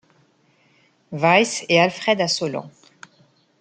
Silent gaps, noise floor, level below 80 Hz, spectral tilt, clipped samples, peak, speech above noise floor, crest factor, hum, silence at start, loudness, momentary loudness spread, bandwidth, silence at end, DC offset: none; -60 dBFS; -70 dBFS; -3.5 dB/octave; under 0.1%; -2 dBFS; 41 dB; 20 dB; none; 1.1 s; -19 LUFS; 13 LU; 9.4 kHz; 0.9 s; under 0.1%